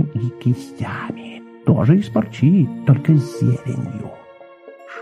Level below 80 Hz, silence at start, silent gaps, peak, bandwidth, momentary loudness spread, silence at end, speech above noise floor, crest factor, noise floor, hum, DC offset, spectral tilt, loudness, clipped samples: -50 dBFS; 0 s; none; -2 dBFS; 11 kHz; 17 LU; 0 s; 24 dB; 16 dB; -42 dBFS; none; under 0.1%; -9 dB/octave; -18 LUFS; under 0.1%